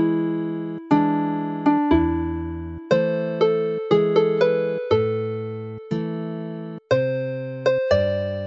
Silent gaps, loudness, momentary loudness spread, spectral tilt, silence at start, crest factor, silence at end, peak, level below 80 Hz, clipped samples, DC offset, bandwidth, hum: none; -22 LUFS; 11 LU; -8 dB/octave; 0 s; 16 dB; 0 s; -4 dBFS; -44 dBFS; under 0.1%; under 0.1%; 7.4 kHz; none